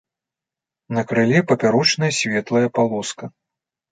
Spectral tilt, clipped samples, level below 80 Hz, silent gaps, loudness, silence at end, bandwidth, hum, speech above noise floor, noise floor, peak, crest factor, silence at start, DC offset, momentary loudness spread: -4.5 dB/octave; under 0.1%; -62 dBFS; none; -18 LUFS; 0.6 s; 9.4 kHz; none; 69 dB; -88 dBFS; -2 dBFS; 18 dB; 0.9 s; under 0.1%; 11 LU